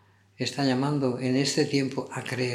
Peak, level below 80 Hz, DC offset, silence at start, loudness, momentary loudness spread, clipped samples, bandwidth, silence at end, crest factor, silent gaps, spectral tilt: -10 dBFS; -76 dBFS; under 0.1%; 0.4 s; -27 LUFS; 8 LU; under 0.1%; 13.5 kHz; 0 s; 16 dB; none; -5 dB/octave